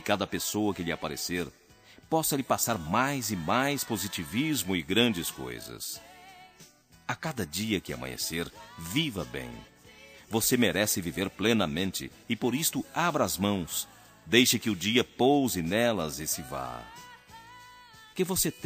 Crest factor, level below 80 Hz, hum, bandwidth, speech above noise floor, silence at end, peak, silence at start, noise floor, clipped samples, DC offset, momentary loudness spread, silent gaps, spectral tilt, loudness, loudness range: 24 dB; -56 dBFS; none; 15.5 kHz; 27 dB; 0 s; -6 dBFS; 0 s; -56 dBFS; under 0.1%; under 0.1%; 15 LU; none; -3.5 dB/octave; -29 LUFS; 7 LU